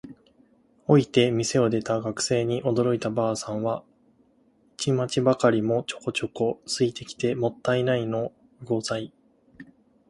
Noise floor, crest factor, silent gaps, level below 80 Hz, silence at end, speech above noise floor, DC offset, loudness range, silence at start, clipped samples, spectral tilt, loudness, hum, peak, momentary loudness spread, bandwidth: -62 dBFS; 22 dB; none; -60 dBFS; 0.45 s; 38 dB; under 0.1%; 3 LU; 0.05 s; under 0.1%; -5.5 dB/octave; -25 LUFS; none; -4 dBFS; 9 LU; 11.5 kHz